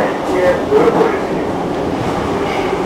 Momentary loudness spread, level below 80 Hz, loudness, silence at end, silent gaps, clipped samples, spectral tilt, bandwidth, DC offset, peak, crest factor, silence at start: 6 LU; -38 dBFS; -15 LUFS; 0 s; none; under 0.1%; -6 dB/octave; 15.5 kHz; under 0.1%; 0 dBFS; 14 dB; 0 s